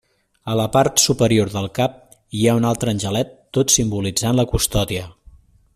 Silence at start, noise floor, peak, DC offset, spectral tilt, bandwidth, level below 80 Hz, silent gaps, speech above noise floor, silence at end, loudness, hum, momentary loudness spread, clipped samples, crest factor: 0.45 s; -48 dBFS; 0 dBFS; under 0.1%; -4 dB/octave; 16 kHz; -38 dBFS; none; 30 dB; 0.65 s; -18 LUFS; none; 9 LU; under 0.1%; 20 dB